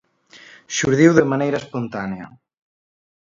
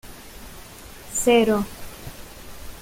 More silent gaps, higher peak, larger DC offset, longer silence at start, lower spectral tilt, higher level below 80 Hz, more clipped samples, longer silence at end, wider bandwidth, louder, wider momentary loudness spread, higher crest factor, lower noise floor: neither; first, 0 dBFS vs -6 dBFS; neither; first, 0.7 s vs 0.05 s; first, -5.5 dB/octave vs -3.5 dB/octave; second, -56 dBFS vs -44 dBFS; neither; first, 0.95 s vs 0 s; second, 7.6 kHz vs 17 kHz; about the same, -19 LUFS vs -21 LUFS; second, 15 LU vs 23 LU; about the same, 20 dB vs 20 dB; first, -47 dBFS vs -41 dBFS